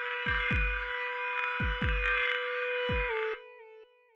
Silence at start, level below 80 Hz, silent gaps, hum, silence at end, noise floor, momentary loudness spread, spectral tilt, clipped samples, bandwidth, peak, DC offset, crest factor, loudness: 0 s; -40 dBFS; none; none; 0.3 s; -55 dBFS; 6 LU; -6 dB/octave; under 0.1%; 7 kHz; -16 dBFS; under 0.1%; 16 dB; -31 LUFS